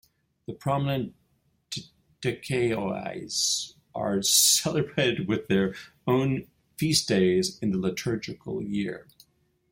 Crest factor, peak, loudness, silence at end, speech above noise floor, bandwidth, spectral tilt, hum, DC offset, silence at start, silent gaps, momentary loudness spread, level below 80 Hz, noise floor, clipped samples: 20 dB; -6 dBFS; -26 LUFS; 0.7 s; 43 dB; 16.5 kHz; -3.5 dB/octave; none; under 0.1%; 0.5 s; none; 16 LU; -60 dBFS; -69 dBFS; under 0.1%